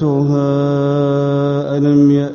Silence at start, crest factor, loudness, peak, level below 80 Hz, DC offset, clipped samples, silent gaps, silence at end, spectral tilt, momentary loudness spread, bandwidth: 0 s; 12 dB; -14 LUFS; -2 dBFS; -52 dBFS; under 0.1%; under 0.1%; none; 0 s; -9 dB/octave; 4 LU; 6.8 kHz